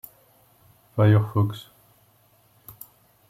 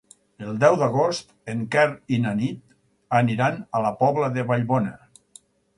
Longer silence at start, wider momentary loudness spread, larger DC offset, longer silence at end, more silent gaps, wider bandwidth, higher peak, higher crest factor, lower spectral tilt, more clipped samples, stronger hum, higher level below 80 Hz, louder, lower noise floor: first, 0.95 s vs 0.4 s; first, 26 LU vs 12 LU; neither; first, 1.7 s vs 0.8 s; neither; first, 16 kHz vs 11.5 kHz; second, -6 dBFS vs -2 dBFS; about the same, 20 dB vs 20 dB; first, -8.5 dB/octave vs -6.5 dB/octave; neither; neither; about the same, -62 dBFS vs -62 dBFS; about the same, -22 LUFS vs -23 LUFS; first, -60 dBFS vs -53 dBFS